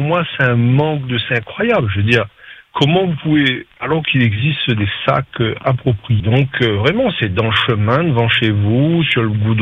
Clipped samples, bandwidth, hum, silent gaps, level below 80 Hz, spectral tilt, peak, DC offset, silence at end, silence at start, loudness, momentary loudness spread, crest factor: under 0.1%; 7.2 kHz; none; none; -46 dBFS; -7.5 dB/octave; 0 dBFS; under 0.1%; 0 s; 0 s; -15 LUFS; 4 LU; 14 dB